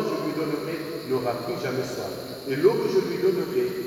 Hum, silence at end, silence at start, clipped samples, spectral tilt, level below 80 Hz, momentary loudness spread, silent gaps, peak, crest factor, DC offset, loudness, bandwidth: none; 0 s; 0 s; under 0.1%; -6 dB/octave; -62 dBFS; 10 LU; none; -8 dBFS; 18 dB; under 0.1%; -26 LUFS; over 20 kHz